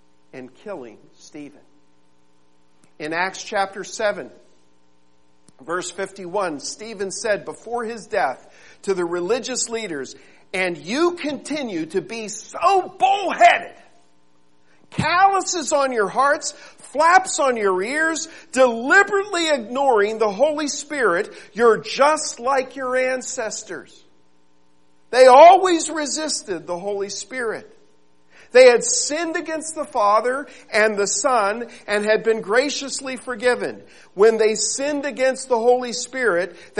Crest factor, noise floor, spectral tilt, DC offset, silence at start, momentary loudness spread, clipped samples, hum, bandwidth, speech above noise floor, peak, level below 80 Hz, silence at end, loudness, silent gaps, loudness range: 20 dB; -62 dBFS; -2.5 dB/octave; 0.3%; 0.35 s; 15 LU; under 0.1%; none; 11.5 kHz; 43 dB; 0 dBFS; -64 dBFS; 0 s; -19 LUFS; none; 12 LU